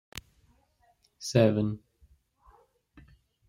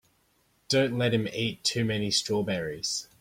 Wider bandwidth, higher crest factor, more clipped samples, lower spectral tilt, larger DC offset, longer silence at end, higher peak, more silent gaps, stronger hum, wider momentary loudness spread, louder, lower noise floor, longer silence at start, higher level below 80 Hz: about the same, 16 kHz vs 16.5 kHz; first, 24 dB vs 18 dB; neither; first, -6.5 dB/octave vs -4 dB/octave; neither; first, 1.7 s vs 0.15 s; about the same, -8 dBFS vs -10 dBFS; neither; neither; first, 22 LU vs 5 LU; about the same, -27 LUFS vs -27 LUFS; about the same, -68 dBFS vs -68 dBFS; first, 1.2 s vs 0.7 s; about the same, -62 dBFS vs -60 dBFS